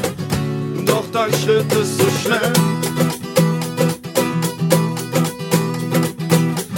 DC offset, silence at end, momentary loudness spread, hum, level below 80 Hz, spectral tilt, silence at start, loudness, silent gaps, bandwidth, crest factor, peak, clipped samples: under 0.1%; 0 s; 4 LU; none; -48 dBFS; -5 dB/octave; 0 s; -18 LUFS; none; 17 kHz; 18 dB; 0 dBFS; under 0.1%